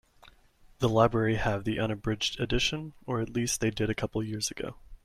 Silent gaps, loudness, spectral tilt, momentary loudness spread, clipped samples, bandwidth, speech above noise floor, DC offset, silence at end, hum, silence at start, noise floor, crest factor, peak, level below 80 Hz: none; -29 LUFS; -4.5 dB/octave; 9 LU; under 0.1%; 15.5 kHz; 30 dB; under 0.1%; 0.1 s; none; 0.8 s; -59 dBFS; 22 dB; -8 dBFS; -46 dBFS